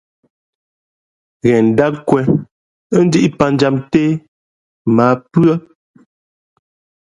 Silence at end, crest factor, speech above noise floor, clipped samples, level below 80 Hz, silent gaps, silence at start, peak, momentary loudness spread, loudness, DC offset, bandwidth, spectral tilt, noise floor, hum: 1.45 s; 16 dB; over 77 dB; under 0.1%; -50 dBFS; 2.51-2.90 s, 4.28-4.85 s; 1.45 s; 0 dBFS; 7 LU; -14 LUFS; under 0.1%; 11 kHz; -7.5 dB/octave; under -90 dBFS; none